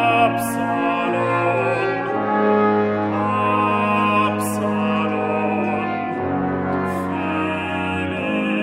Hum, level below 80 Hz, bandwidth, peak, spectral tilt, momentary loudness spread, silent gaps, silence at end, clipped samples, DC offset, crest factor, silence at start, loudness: none; -56 dBFS; 16.5 kHz; -4 dBFS; -6 dB/octave; 6 LU; none; 0 s; under 0.1%; under 0.1%; 16 dB; 0 s; -20 LUFS